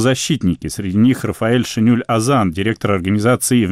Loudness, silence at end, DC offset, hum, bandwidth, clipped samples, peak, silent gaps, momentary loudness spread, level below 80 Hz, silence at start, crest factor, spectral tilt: -16 LUFS; 0 s; under 0.1%; none; 16 kHz; under 0.1%; -4 dBFS; none; 4 LU; -44 dBFS; 0 s; 10 dB; -5.5 dB/octave